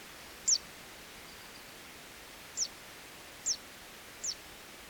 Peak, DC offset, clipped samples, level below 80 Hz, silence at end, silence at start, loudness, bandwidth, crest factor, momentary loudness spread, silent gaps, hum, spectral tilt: -18 dBFS; under 0.1%; under 0.1%; -66 dBFS; 0 s; 0 s; -34 LUFS; over 20 kHz; 22 dB; 19 LU; none; none; 1 dB/octave